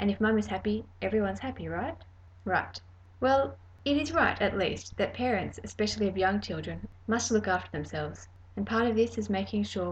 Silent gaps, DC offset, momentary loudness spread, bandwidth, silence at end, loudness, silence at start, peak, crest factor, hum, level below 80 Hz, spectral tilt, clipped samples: none; under 0.1%; 12 LU; 8.6 kHz; 0 s; -30 LUFS; 0 s; -12 dBFS; 18 dB; none; -52 dBFS; -5 dB/octave; under 0.1%